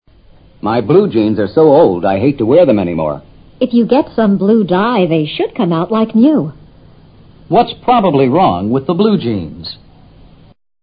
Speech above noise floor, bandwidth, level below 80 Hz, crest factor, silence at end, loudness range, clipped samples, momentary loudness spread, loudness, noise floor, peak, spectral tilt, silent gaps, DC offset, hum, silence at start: 32 dB; 5.2 kHz; -44 dBFS; 12 dB; 1.1 s; 2 LU; under 0.1%; 10 LU; -12 LUFS; -43 dBFS; 0 dBFS; -11 dB/octave; none; under 0.1%; none; 0.65 s